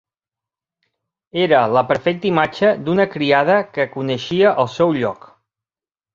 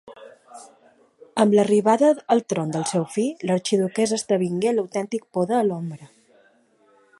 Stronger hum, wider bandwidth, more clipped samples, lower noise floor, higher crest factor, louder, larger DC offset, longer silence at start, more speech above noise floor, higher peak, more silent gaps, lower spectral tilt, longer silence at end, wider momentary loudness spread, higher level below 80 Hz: neither; second, 7.4 kHz vs 11.5 kHz; neither; first, under -90 dBFS vs -59 dBFS; about the same, 18 dB vs 20 dB; first, -17 LUFS vs -22 LUFS; neither; first, 1.35 s vs 0.05 s; first, over 74 dB vs 38 dB; about the same, 0 dBFS vs -2 dBFS; neither; about the same, -6.5 dB/octave vs -5.5 dB/octave; second, 1 s vs 1.15 s; about the same, 8 LU vs 10 LU; first, -58 dBFS vs -70 dBFS